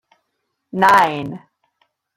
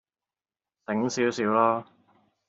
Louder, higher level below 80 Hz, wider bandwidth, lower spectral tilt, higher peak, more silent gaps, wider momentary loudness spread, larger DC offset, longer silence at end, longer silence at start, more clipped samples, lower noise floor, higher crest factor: first, -15 LUFS vs -26 LUFS; first, -60 dBFS vs -74 dBFS; first, 16.5 kHz vs 8 kHz; about the same, -4.5 dB/octave vs -5 dB/octave; first, 0 dBFS vs -8 dBFS; neither; first, 19 LU vs 9 LU; neither; first, 0.8 s vs 0.65 s; second, 0.75 s vs 0.9 s; neither; second, -74 dBFS vs under -90 dBFS; about the same, 18 dB vs 20 dB